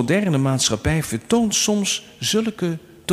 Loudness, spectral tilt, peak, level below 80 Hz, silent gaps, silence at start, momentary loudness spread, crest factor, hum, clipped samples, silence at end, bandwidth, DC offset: -20 LUFS; -4 dB/octave; -6 dBFS; -42 dBFS; none; 0 s; 7 LU; 16 dB; none; under 0.1%; 0 s; 16 kHz; under 0.1%